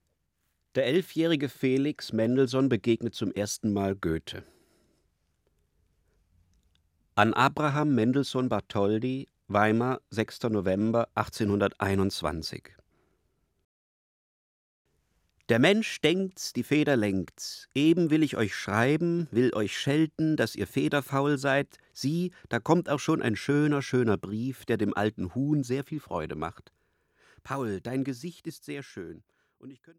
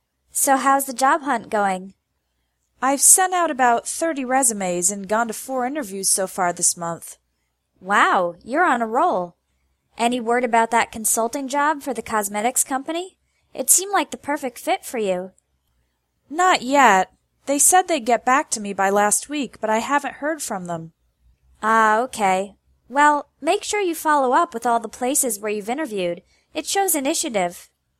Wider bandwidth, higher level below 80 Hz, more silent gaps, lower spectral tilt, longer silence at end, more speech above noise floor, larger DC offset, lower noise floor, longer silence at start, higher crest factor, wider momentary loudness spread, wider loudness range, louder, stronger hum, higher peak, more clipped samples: about the same, 16 kHz vs 16 kHz; about the same, -60 dBFS vs -64 dBFS; first, 13.65-14.85 s vs none; first, -6 dB/octave vs -2 dB/octave; about the same, 0.25 s vs 0.35 s; about the same, 49 dB vs 52 dB; neither; first, -77 dBFS vs -72 dBFS; first, 0.75 s vs 0.35 s; about the same, 24 dB vs 22 dB; about the same, 10 LU vs 12 LU; first, 9 LU vs 4 LU; second, -28 LUFS vs -20 LUFS; neither; second, -4 dBFS vs 0 dBFS; neither